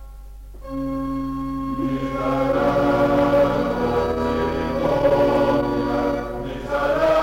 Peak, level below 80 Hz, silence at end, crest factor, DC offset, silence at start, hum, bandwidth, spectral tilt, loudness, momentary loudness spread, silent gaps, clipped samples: -8 dBFS; -36 dBFS; 0 s; 12 dB; under 0.1%; 0 s; none; 16.5 kHz; -7 dB/octave; -21 LUFS; 9 LU; none; under 0.1%